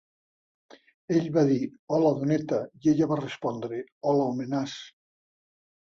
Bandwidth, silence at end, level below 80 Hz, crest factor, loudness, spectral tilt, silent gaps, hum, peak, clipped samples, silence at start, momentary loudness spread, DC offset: 7.4 kHz; 1.05 s; -68 dBFS; 18 dB; -27 LUFS; -7.5 dB/octave; 1.79-1.87 s, 3.92-4.01 s; none; -10 dBFS; under 0.1%; 1.1 s; 9 LU; under 0.1%